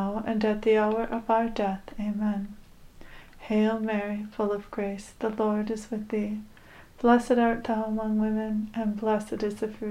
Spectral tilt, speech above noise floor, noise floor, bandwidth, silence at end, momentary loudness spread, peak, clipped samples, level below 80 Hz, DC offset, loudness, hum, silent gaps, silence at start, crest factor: -7 dB/octave; 21 dB; -47 dBFS; 11.5 kHz; 0 s; 10 LU; -8 dBFS; under 0.1%; -50 dBFS; under 0.1%; -28 LUFS; none; none; 0 s; 20 dB